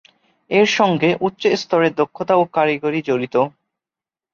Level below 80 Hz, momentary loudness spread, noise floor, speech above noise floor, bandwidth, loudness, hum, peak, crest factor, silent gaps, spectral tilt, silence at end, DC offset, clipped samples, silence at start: -64 dBFS; 5 LU; -90 dBFS; 72 dB; 7.4 kHz; -18 LUFS; none; -2 dBFS; 16 dB; none; -5.5 dB/octave; 0.85 s; under 0.1%; under 0.1%; 0.5 s